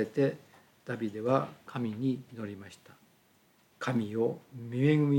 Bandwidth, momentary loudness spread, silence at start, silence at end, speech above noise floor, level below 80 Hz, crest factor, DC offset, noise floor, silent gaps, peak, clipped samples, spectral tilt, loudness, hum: 17 kHz; 14 LU; 0 s; 0 s; 35 dB; -80 dBFS; 18 dB; under 0.1%; -66 dBFS; none; -14 dBFS; under 0.1%; -8 dB/octave; -33 LUFS; none